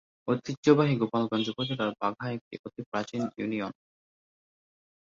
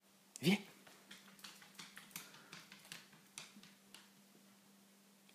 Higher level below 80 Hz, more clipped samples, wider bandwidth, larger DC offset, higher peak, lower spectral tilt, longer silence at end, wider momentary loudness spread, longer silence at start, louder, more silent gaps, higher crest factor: first, -68 dBFS vs under -90 dBFS; neither; second, 7.4 kHz vs 15.5 kHz; neither; first, -8 dBFS vs -22 dBFS; first, -6.5 dB/octave vs -4.5 dB/octave; first, 1.3 s vs 0.5 s; second, 14 LU vs 27 LU; about the same, 0.25 s vs 0.35 s; first, -29 LUFS vs -45 LUFS; first, 0.57-0.63 s, 2.41-2.51 s, 2.59-2.64 s, 2.86-2.92 s vs none; about the same, 22 dB vs 26 dB